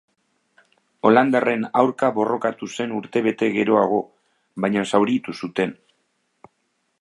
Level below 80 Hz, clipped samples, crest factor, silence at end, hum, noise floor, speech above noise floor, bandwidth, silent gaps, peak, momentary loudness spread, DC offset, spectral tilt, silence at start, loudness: -68 dBFS; under 0.1%; 20 dB; 1.3 s; none; -71 dBFS; 51 dB; 11.5 kHz; none; -2 dBFS; 10 LU; under 0.1%; -6 dB/octave; 1.05 s; -21 LUFS